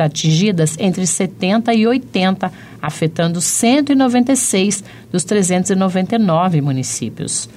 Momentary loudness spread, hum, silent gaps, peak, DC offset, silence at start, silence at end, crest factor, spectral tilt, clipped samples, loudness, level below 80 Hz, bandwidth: 8 LU; none; none; -4 dBFS; under 0.1%; 0 s; 0.05 s; 10 dB; -4.5 dB/octave; under 0.1%; -15 LUFS; -56 dBFS; 15.5 kHz